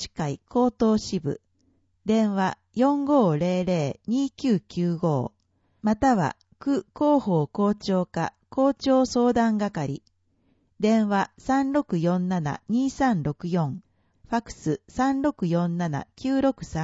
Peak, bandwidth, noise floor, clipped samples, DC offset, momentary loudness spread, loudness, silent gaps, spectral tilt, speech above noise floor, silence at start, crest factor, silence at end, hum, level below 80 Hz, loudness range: -8 dBFS; 8 kHz; -67 dBFS; under 0.1%; under 0.1%; 9 LU; -25 LUFS; none; -7 dB/octave; 43 dB; 0 s; 16 dB; 0 s; none; -54 dBFS; 3 LU